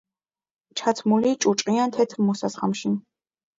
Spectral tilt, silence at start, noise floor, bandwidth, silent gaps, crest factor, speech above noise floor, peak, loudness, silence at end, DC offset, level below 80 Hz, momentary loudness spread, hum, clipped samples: -5 dB/octave; 0.75 s; under -90 dBFS; 7.8 kHz; none; 18 dB; over 68 dB; -6 dBFS; -23 LUFS; 0.6 s; under 0.1%; -70 dBFS; 6 LU; none; under 0.1%